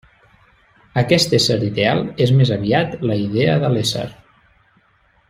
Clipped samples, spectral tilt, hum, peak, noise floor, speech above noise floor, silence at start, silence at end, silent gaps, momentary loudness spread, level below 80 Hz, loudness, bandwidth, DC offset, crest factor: under 0.1%; -5.5 dB/octave; none; -2 dBFS; -58 dBFS; 41 dB; 0.95 s; 1.15 s; none; 7 LU; -50 dBFS; -17 LUFS; 15.5 kHz; under 0.1%; 16 dB